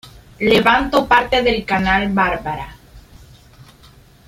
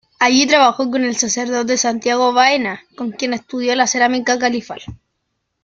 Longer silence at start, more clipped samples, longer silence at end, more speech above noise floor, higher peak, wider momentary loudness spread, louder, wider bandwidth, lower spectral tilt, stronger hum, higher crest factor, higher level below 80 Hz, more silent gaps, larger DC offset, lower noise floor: second, 0.05 s vs 0.2 s; neither; first, 1.25 s vs 0.7 s; second, 31 dB vs 56 dB; about the same, -2 dBFS vs 0 dBFS; about the same, 12 LU vs 12 LU; about the same, -16 LUFS vs -15 LUFS; first, 16 kHz vs 8.6 kHz; first, -5.5 dB/octave vs -2 dB/octave; neither; about the same, 18 dB vs 16 dB; first, -38 dBFS vs -56 dBFS; neither; neither; second, -46 dBFS vs -72 dBFS